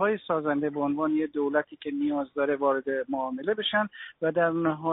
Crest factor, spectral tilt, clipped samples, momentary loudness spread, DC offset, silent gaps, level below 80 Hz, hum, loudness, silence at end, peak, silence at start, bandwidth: 16 dB; -3.5 dB/octave; under 0.1%; 5 LU; under 0.1%; none; -70 dBFS; none; -28 LUFS; 0 s; -12 dBFS; 0 s; 4 kHz